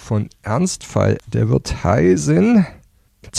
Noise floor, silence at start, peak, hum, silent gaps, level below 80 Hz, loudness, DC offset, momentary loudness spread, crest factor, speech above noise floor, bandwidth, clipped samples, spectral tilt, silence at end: -46 dBFS; 0.05 s; -4 dBFS; none; none; -38 dBFS; -17 LUFS; under 0.1%; 9 LU; 14 dB; 29 dB; 13 kHz; under 0.1%; -6.5 dB/octave; 0 s